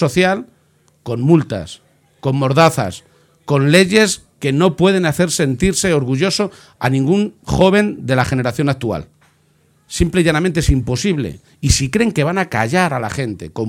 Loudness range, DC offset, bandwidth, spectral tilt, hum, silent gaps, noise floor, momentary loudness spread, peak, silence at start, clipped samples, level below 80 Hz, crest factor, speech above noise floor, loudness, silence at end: 4 LU; under 0.1%; 17 kHz; -5 dB/octave; none; none; -56 dBFS; 12 LU; 0 dBFS; 0 s; under 0.1%; -32 dBFS; 16 dB; 41 dB; -16 LUFS; 0 s